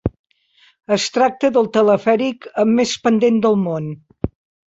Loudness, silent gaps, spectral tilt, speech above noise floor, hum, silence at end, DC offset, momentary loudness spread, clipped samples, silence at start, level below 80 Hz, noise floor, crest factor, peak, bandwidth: -17 LUFS; 0.19-0.24 s; -5.5 dB/octave; 39 dB; none; 0.4 s; under 0.1%; 13 LU; under 0.1%; 0.05 s; -42 dBFS; -55 dBFS; 14 dB; -2 dBFS; 8 kHz